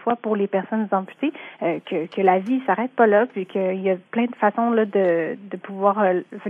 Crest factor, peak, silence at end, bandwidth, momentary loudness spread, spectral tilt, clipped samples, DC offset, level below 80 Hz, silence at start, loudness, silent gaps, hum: 18 dB; -4 dBFS; 0 s; 4.5 kHz; 9 LU; -9 dB/octave; under 0.1%; under 0.1%; -88 dBFS; 0 s; -22 LUFS; none; none